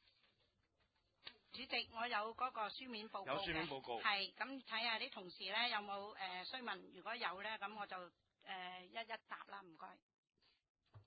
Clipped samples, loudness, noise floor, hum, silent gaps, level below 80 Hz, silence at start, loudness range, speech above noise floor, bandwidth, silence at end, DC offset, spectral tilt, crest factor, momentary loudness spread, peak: under 0.1%; -45 LUFS; -83 dBFS; none; 10.02-10.09 s, 10.18-10.23 s, 10.69-10.75 s; -78 dBFS; 1.25 s; 7 LU; 36 dB; 4.8 kHz; 0.05 s; under 0.1%; 0.5 dB/octave; 24 dB; 16 LU; -24 dBFS